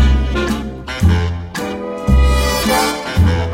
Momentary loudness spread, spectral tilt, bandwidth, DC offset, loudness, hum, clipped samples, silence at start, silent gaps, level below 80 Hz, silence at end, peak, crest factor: 9 LU; -5.5 dB/octave; 16.5 kHz; under 0.1%; -16 LUFS; none; under 0.1%; 0 s; none; -18 dBFS; 0 s; -2 dBFS; 12 dB